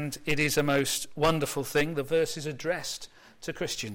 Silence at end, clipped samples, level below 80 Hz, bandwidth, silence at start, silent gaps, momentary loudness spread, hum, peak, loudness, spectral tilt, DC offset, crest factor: 0 s; under 0.1%; -52 dBFS; 16.5 kHz; 0 s; none; 12 LU; none; -14 dBFS; -28 LUFS; -4 dB/octave; under 0.1%; 14 dB